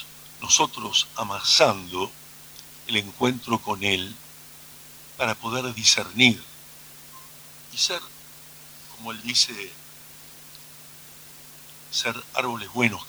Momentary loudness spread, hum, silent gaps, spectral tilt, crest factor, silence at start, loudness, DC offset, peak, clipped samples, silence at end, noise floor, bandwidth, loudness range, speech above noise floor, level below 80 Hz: 24 LU; none; none; -1.5 dB/octave; 24 dB; 0 s; -23 LUFS; under 0.1%; -2 dBFS; under 0.1%; 0 s; -46 dBFS; over 20 kHz; 7 LU; 21 dB; -64 dBFS